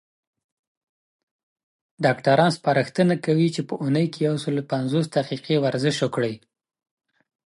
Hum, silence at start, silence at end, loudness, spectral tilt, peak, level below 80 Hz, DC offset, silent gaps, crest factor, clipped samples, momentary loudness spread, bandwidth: none; 2 s; 1.1 s; -22 LUFS; -6.5 dB/octave; -4 dBFS; -70 dBFS; under 0.1%; none; 20 dB; under 0.1%; 7 LU; 11.5 kHz